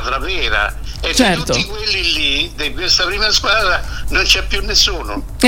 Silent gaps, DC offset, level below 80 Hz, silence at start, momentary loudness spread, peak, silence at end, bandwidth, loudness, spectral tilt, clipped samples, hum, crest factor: none; under 0.1%; -26 dBFS; 0 s; 7 LU; 0 dBFS; 0 s; 16.5 kHz; -14 LUFS; -2.5 dB/octave; under 0.1%; none; 16 dB